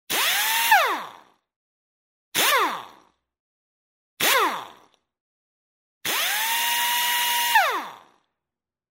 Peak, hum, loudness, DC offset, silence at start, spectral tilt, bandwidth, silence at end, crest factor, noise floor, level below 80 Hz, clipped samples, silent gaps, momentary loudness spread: -4 dBFS; none; -21 LUFS; under 0.1%; 0.1 s; 1 dB/octave; 16.5 kHz; 0.95 s; 22 dB; -89 dBFS; -76 dBFS; under 0.1%; 1.56-2.32 s, 3.40-4.17 s, 5.20-6.01 s; 13 LU